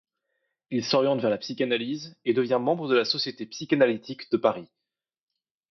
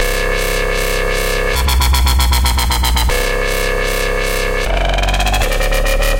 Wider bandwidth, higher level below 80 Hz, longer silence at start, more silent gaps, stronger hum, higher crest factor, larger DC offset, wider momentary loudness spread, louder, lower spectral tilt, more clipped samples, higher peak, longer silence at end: second, 6.6 kHz vs 17 kHz; second, -74 dBFS vs -16 dBFS; first, 0.7 s vs 0 s; neither; neither; first, 20 dB vs 10 dB; neither; first, 9 LU vs 4 LU; second, -26 LUFS vs -15 LUFS; first, -5 dB/octave vs -3.5 dB/octave; neither; second, -8 dBFS vs -4 dBFS; first, 1.05 s vs 0 s